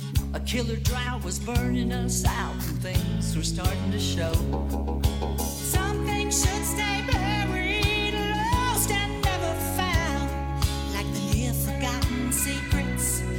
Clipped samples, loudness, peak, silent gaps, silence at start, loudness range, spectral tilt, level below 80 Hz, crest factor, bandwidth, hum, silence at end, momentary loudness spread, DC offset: under 0.1%; -26 LUFS; -10 dBFS; none; 0 s; 2 LU; -4 dB/octave; -32 dBFS; 16 dB; 17 kHz; none; 0 s; 5 LU; under 0.1%